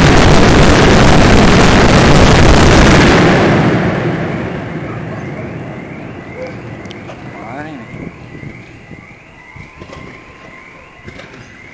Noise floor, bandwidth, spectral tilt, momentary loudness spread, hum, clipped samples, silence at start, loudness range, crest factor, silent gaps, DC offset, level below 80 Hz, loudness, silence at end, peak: -36 dBFS; 8 kHz; -5.5 dB/octave; 23 LU; none; 0.1%; 0 s; 23 LU; 10 dB; none; under 0.1%; -20 dBFS; -8 LUFS; 0 s; 0 dBFS